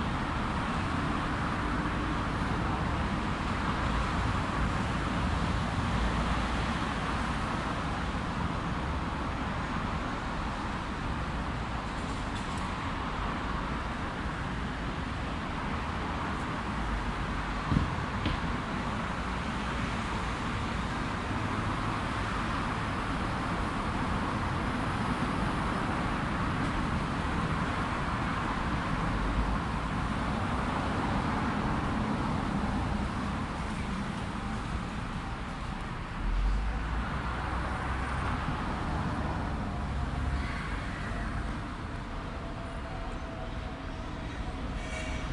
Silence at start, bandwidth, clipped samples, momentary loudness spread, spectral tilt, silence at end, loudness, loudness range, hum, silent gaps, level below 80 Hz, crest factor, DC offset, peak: 0 s; 11.5 kHz; under 0.1%; 5 LU; -6 dB/octave; 0 s; -33 LUFS; 4 LU; none; none; -38 dBFS; 20 dB; under 0.1%; -12 dBFS